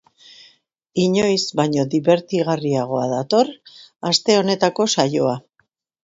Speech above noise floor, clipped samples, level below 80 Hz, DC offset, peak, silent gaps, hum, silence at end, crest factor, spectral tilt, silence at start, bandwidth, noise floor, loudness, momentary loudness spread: 48 dB; under 0.1%; -62 dBFS; under 0.1%; 0 dBFS; none; none; 0.65 s; 20 dB; -4.5 dB/octave; 0.95 s; 8 kHz; -66 dBFS; -19 LUFS; 6 LU